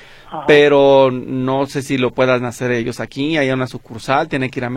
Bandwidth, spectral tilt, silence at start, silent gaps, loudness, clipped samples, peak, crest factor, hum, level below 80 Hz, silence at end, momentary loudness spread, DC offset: 14 kHz; -6 dB/octave; 0.25 s; none; -16 LUFS; under 0.1%; 0 dBFS; 16 dB; none; -48 dBFS; 0 s; 12 LU; under 0.1%